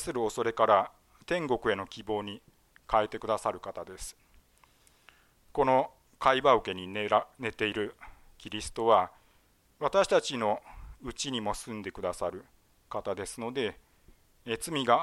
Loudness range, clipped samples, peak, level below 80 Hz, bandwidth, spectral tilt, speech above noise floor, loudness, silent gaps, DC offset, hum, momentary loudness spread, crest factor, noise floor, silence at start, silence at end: 7 LU; under 0.1%; -10 dBFS; -56 dBFS; 16 kHz; -4 dB/octave; 36 dB; -30 LUFS; none; under 0.1%; none; 16 LU; 22 dB; -66 dBFS; 0 s; 0 s